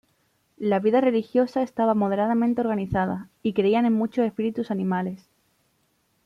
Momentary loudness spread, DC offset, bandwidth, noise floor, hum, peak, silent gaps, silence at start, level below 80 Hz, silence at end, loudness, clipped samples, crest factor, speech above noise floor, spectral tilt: 8 LU; under 0.1%; 6.4 kHz; -69 dBFS; none; -8 dBFS; none; 0.6 s; -56 dBFS; 1.1 s; -24 LUFS; under 0.1%; 16 dB; 46 dB; -8.5 dB/octave